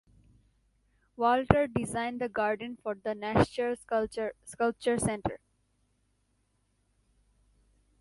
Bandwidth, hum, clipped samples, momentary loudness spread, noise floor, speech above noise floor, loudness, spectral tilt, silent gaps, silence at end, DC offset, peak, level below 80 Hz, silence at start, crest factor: 11.5 kHz; 50 Hz at -60 dBFS; under 0.1%; 10 LU; -74 dBFS; 44 dB; -30 LUFS; -5.5 dB/octave; none; 2.65 s; under 0.1%; -2 dBFS; -52 dBFS; 1.2 s; 30 dB